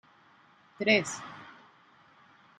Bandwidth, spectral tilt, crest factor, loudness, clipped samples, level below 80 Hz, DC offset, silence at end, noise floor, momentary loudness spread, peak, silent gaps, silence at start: 12 kHz; -3.5 dB/octave; 24 dB; -28 LUFS; under 0.1%; -80 dBFS; under 0.1%; 1.1 s; -61 dBFS; 24 LU; -10 dBFS; none; 0.8 s